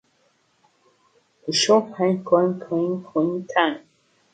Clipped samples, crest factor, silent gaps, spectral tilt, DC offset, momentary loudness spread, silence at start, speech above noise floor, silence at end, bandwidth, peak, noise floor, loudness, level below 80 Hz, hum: under 0.1%; 20 dB; none; -4.5 dB/octave; under 0.1%; 7 LU; 1.45 s; 44 dB; 0.55 s; 9.4 kHz; -4 dBFS; -65 dBFS; -21 LUFS; -72 dBFS; none